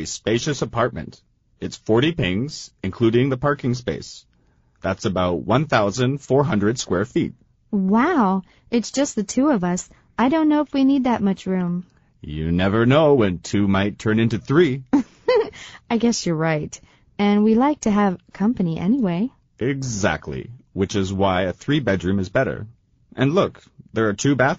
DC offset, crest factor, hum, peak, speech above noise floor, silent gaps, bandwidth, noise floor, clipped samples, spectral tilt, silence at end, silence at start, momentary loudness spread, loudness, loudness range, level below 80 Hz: under 0.1%; 16 dB; none; -4 dBFS; 40 dB; none; 8 kHz; -60 dBFS; under 0.1%; -5.5 dB/octave; 0 s; 0 s; 12 LU; -21 LUFS; 3 LU; -48 dBFS